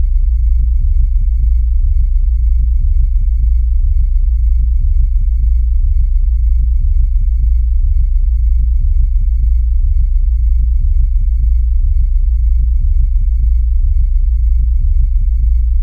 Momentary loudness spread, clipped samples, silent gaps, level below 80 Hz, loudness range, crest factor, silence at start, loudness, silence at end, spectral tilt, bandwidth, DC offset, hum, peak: 1 LU; under 0.1%; none; -10 dBFS; 0 LU; 8 dB; 0 s; -16 LUFS; 0 s; -10 dB/octave; 0.3 kHz; under 0.1%; none; -2 dBFS